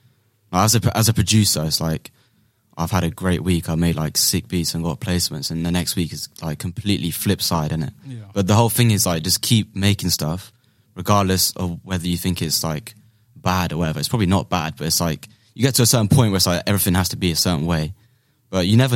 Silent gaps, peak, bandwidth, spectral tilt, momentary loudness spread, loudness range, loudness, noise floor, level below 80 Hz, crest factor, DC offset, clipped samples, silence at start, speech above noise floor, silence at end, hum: none; -2 dBFS; 16.5 kHz; -4.5 dB/octave; 11 LU; 4 LU; -19 LUFS; -61 dBFS; -42 dBFS; 18 dB; under 0.1%; under 0.1%; 0.5 s; 41 dB; 0 s; none